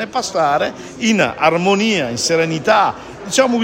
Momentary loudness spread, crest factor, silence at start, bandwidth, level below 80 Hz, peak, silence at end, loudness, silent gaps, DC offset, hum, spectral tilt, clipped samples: 6 LU; 16 dB; 0 s; 16.5 kHz; -52 dBFS; 0 dBFS; 0 s; -16 LUFS; none; under 0.1%; none; -3.5 dB/octave; under 0.1%